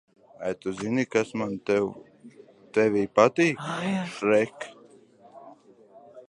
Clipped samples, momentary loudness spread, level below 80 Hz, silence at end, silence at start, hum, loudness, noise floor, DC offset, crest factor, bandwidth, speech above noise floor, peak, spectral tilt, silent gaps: under 0.1%; 13 LU; -66 dBFS; 0.05 s; 0.4 s; none; -26 LUFS; -54 dBFS; under 0.1%; 24 dB; 11 kHz; 29 dB; -4 dBFS; -5.5 dB/octave; none